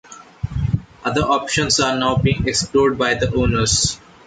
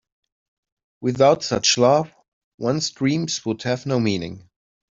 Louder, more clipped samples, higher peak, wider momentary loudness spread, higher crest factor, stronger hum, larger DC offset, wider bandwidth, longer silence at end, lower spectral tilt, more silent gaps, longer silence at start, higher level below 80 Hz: about the same, -18 LUFS vs -20 LUFS; neither; about the same, -4 dBFS vs -2 dBFS; second, 7 LU vs 11 LU; second, 14 dB vs 20 dB; neither; neither; first, 9.4 kHz vs 7.8 kHz; second, 0.3 s vs 0.55 s; about the same, -4 dB/octave vs -4.5 dB/octave; second, none vs 2.28-2.58 s; second, 0.1 s vs 1 s; first, -34 dBFS vs -60 dBFS